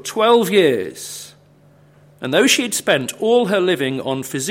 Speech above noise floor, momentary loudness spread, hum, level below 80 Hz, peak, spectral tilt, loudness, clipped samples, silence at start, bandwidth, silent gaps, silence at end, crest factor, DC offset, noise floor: 33 dB; 16 LU; 50 Hz at -60 dBFS; -66 dBFS; -2 dBFS; -3.5 dB/octave; -16 LUFS; under 0.1%; 0.05 s; 16.5 kHz; none; 0 s; 16 dB; under 0.1%; -50 dBFS